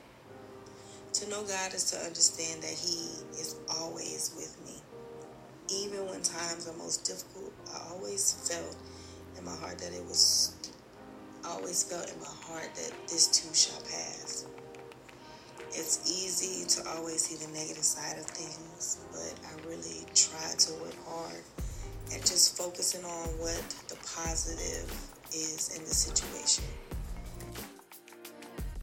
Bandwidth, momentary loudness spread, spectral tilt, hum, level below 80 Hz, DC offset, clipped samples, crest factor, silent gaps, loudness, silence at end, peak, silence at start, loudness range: 16.5 kHz; 22 LU; -1 dB/octave; none; -50 dBFS; under 0.1%; under 0.1%; 26 dB; none; -31 LUFS; 0 s; -8 dBFS; 0 s; 6 LU